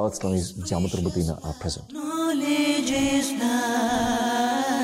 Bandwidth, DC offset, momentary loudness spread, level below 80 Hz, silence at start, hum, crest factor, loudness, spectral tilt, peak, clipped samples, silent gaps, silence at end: 16 kHz; under 0.1%; 8 LU; -48 dBFS; 0 s; none; 12 dB; -25 LUFS; -4.5 dB/octave; -12 dBFS; under 0.1%; none; 0 s